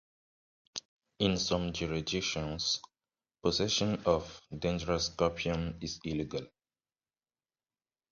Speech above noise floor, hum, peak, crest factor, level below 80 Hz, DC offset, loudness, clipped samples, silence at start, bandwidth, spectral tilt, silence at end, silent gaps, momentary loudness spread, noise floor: over 57 dB; none; -12 dBFS; 22 dB; -52 dBFS; under 0.1%; -33 LUFS; under 0.1%; 0.75 s; 7.6 kHz; -4 dB/octave; 1.65 s; 0.85-0.97 s; 11 LU; under -90 dBFS